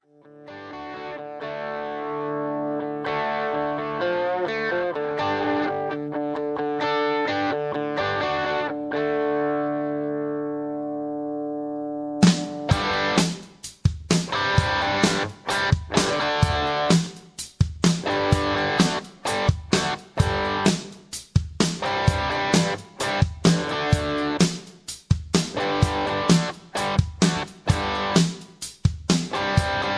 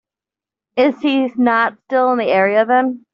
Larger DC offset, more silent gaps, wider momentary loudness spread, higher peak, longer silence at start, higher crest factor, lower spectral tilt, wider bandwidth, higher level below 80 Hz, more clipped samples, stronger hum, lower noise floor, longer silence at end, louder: neither; neither; first, 9 LU vs 3 LU; about the same, -2 dBFS vs -2 dBFS; second, 0.35 s vs 0.75 s; first, 22 dB vs 14 dB; first, -5 dB/octave vs -2.5 dB/octave; first, 11 kHz vs 5.8 kHz; first, -40 dBFS vs -66 dBFS; neither; neither; second, -47 dBFS vs -88 dBFS; second, 0 s vs 0.15 s; second, -24 LUFS vs -16 LUFS